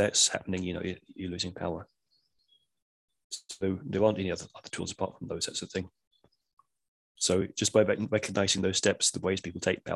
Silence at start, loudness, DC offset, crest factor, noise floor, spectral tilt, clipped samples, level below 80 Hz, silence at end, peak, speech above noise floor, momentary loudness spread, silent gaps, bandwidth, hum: 0 s; -30 LUFS; under 0.1%; 22 dB; -74 dBFS; -3 dB/octave; under 0.1%; -54 dBFS; 0 s; -10 dBFS; 44 dB; 13 LU; 2.82-3.08 s, 3.24-3.30 s, 6.07-6.11 s, 6.53-6.57 s, 6.88-7.15 s; 12.5 kHz; none